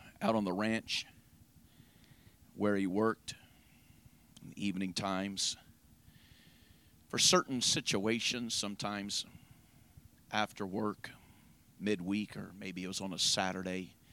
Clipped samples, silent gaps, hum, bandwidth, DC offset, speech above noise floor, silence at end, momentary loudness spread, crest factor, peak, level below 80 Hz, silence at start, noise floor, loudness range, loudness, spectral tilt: under 0.1%; none; none; 17.5 kHz; under 0.1%; 28 dB; 0.25 s; 15 LU; 22 dB; -14 dBFS; -68 dBFS; 0 s; -63 dBFS; 8 LU; -34 LUFS; -3 dB/octave